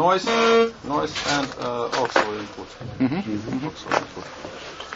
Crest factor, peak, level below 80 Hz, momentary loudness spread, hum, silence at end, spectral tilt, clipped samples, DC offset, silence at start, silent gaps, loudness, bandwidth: 20 dB; -2 dBFS; -52 dBFS; 17 LU; none; 0 s; -4 dB/octave; under 0.1%; under 0.1%; 0 s; none; -23 LUFS; 8 kHz